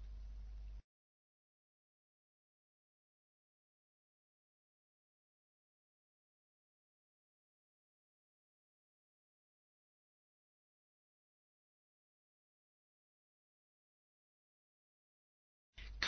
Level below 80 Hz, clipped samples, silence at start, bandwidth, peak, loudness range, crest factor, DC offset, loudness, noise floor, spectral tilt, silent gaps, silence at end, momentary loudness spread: -62 dBFS; under 0.1%; 0 s; 6.2 kHz; -20 dBFS; 6 LU; 38 dB; under 0.1%; -56 LUFS; under -90 dBFS; -0.5 dB/octave; 0.84-15.73 s; 0 s; 6 LU